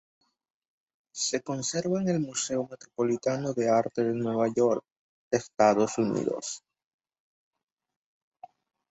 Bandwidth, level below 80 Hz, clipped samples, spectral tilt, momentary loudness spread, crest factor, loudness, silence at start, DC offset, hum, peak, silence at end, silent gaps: 8.2 kHz; -70 dBFS; under 0.1%; -4.5 dB/octave; 9 LU; 20 dB; -28 LUFS; 1.15 s; under 0.1%; none; -8 dBFS; 2.35 s; 4.92-5.31 s